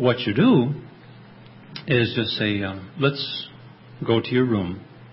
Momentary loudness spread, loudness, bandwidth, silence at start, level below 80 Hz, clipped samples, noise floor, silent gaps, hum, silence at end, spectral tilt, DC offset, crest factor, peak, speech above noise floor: 17 LU; -22 LUFS; 5.8 kHz; 0 s; -52 dBFS; under 0.1%; -45 dBFS; none; none; 0 s; -11 dB/octave; under 0.1%; 18 dB; -4 dBFS; 24 dB